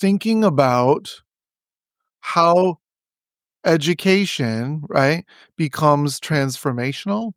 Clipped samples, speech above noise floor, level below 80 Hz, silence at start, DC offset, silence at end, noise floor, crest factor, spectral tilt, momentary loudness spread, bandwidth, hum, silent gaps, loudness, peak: under 0.1%; over 72 dB; -64 dBFS; 0 s; under 0.1%; 0.05 s; under -90 dBFS; 18 dB; -6 dB/octave; 9 LU; 16.5 kHz; none; none; -19 LUFS; -2 dBFS